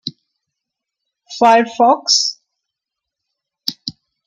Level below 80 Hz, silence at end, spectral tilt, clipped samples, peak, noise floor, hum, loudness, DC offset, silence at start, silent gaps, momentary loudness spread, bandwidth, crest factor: -68 dBFS; 0.35 s; -1.5 dB/octave; under 0.1%; -2 dBFS; -82 dBFS; none; -14 LUFS; under 0.1%; 0.05 s; none; 18 LU; 15.5 kHz; 18 dB